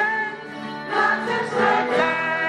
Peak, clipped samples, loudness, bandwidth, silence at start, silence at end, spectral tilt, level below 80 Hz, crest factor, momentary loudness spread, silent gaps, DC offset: -6 dBFS; under 0.1%; -21 LUFS; 11 kHz; 0 s; 0 s; -4.5 dB/octave; -68 dBFS; 16 dB; 12 LU; none; under 0.1%